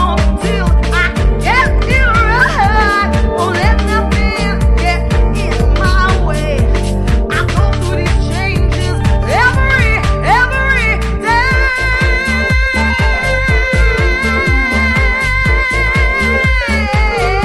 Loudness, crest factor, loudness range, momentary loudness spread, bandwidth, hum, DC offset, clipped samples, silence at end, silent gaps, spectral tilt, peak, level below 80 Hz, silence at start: -12 LUFS; 12 dB; 2 LU; 4 LU; 13 kHz; none; under 0.1%; under 0.1%; 0 s; none; -5.5 dB/octave; 0 dBFS; -14 dBFS; 0 s